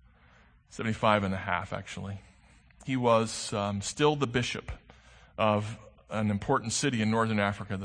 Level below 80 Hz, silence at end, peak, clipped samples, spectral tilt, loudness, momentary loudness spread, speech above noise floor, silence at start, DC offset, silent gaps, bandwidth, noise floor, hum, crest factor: -56 dBFS; 0 s; -8 dBFS; under 0.1%; -5 dB/octave; -29 LUFS; 17 LU; 31 dB; 0.75 s; under 0.1%; none; 9.8 kHz; -60 dBFS; none; 22 dB